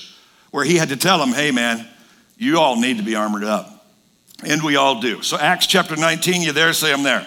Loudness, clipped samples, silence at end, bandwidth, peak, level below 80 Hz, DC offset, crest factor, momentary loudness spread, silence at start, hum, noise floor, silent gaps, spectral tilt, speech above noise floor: -17 LUFS; under 0.1%; 0 s; 18 kHz; 0 dBFS; -66 dBFS; under 0.1%; 18 dB; 8 LU; 0 s; none; -55 dBFS; none; -3 dB/octave; 37 dB